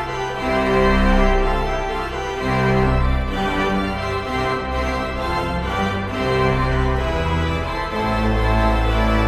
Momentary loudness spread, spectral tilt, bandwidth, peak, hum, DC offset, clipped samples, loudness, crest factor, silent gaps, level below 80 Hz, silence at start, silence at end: 6 LU; -6.5 dB/octave; 13.5 kHz; -4 dBFS; none; under 0.1%; under 0.1%; -20 LUFS; 16 dB; none; -24 dBFS; 0 s; 0 s